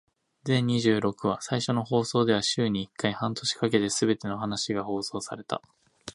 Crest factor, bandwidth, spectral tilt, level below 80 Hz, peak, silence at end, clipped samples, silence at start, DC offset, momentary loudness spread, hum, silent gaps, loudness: 20 dB; 11.5 kHz; -4.5 dB/octave; -62 dBFS; -8 dBFS; 0.05 s; under 0.1%; 0.45 s; under 0.1%; 10 LU; none; none; -27 LUFS